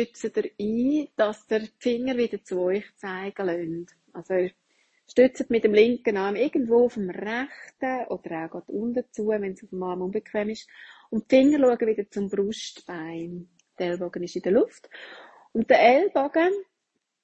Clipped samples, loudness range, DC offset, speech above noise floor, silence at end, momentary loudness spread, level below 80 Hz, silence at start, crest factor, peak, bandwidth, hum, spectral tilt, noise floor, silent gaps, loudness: under 0.1%; 7 LU; under 0.1%; 55 dB; 0.6 s; 15 LU; -66 dBFS; 0 s; 20 dB; -4 dBFS; 8.6 kHz; none; -6 dB/octave; -79 dBFS; none; -25 LUFS